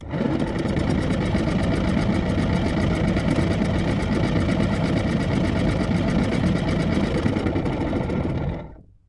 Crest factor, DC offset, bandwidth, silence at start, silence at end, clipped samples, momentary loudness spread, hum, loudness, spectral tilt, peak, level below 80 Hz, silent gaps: 16 dB; under 0.1%; 11.5 kHz; 0 s; 0.35 s; under 0.1%; 3 LU; none; -23 LUFS; -7.5 dB/octave; -6 dBFS; -32 dBFS; none